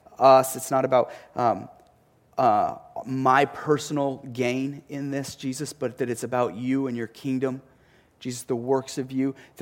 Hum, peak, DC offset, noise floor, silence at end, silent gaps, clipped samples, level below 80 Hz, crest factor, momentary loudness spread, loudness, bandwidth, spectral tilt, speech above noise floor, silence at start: none; -4 dBFS; under 0.1%; -60 dBFS; 0 s; none; under 0.1%; -68 dBFS; 20 dB; 12 LU; -25 LUFS; 17 kHz; -5.5 dB/octave; 35 dB; 0.1 s